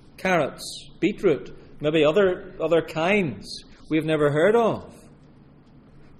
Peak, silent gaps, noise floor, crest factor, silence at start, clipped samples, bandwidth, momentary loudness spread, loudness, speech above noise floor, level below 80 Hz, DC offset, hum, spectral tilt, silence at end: -8 dBFS; none; -51 dBFS; 16 dB; 0.2 s; under 0.1%; 14.5 kHz; 16 LU; -23 LUFS; 28 dB; -50 dBFS; under 0.1%; none; -6 dB/octave; 1.25 s